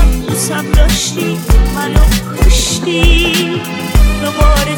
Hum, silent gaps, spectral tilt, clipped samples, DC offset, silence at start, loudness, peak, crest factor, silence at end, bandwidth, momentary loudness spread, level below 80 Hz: none; none; -4 dB/octave; under 0.1%; under 0.1%; 0 s; -12 LUFS; 0 dBFS; 10 dB; 0 s; 19.5 kHz; 5 LU; -12 dBFS